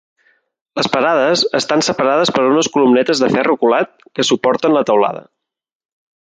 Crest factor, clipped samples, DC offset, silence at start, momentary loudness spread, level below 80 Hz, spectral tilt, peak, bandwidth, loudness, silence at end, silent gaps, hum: 14 dB; under 0.1%; under 0.1%; 0.75 s; 6 LU; -60 dBFS; -3.5 dB/octave; -2 dBFS; 9.4 kHz; -14 LUFS; 1.1 s; none; none